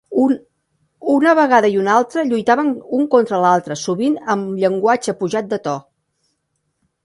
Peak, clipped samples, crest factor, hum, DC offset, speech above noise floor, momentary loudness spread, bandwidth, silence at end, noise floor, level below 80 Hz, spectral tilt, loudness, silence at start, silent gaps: 0 dBFS; under 0.1%; 16 dB; none; under 0.1%; 55 dB; 9 LU; 11.5 kHz; 1.25 s; -70 dBFS; -64 dBFS; -5.5 dB/octave; -17 LUFS; 0.1 s; none